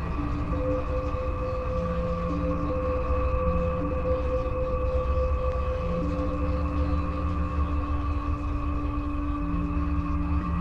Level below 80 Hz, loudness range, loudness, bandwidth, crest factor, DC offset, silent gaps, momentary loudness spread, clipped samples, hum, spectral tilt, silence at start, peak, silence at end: -30 dBFS; 2 LU; -29 LUFS; 6.4 kHz; 14 dB; under 0.1%; none; 3 LU; under 0.1%; none; -9.5 dB/octave; 0 s; -12 dBFS; 0 s